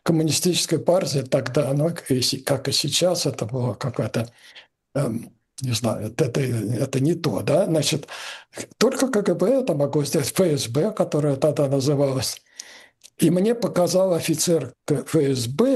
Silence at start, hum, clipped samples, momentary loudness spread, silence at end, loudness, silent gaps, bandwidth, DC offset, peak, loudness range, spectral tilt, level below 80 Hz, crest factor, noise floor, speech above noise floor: 0.05 s; none; under 0.1%; 8 LU; 0 s; -22 LUFS; none; 13 kHz; under 0.1%; 0 dBFS; 4 LU; -5 dB/octave; -60 dBFS; 22 dB; -43 dBFS; 22 dB